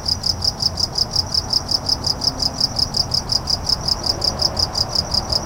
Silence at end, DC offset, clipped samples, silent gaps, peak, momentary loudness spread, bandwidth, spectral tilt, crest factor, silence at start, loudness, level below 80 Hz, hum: 0 s; under 0.1%; under 0.1%; none; -4 dBFS; 1 LU; 17 kHz; -2.5 dB/octave; 16 dB; 0 s; -18 LUFS; -34 dBFS; none